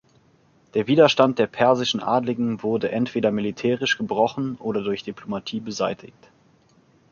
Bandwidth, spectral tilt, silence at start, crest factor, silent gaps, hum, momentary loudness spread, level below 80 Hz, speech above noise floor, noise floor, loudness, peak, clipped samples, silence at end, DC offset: 7.2 kHz; -5.5 dB/octave; 0.75 s; 20 dB; none; none; 12 LU; -62 dBFS; 37 dB; -59 dBFS; -22 LUFS; -2 dBFS; under 0.1%; 1.05 s; under 0.1%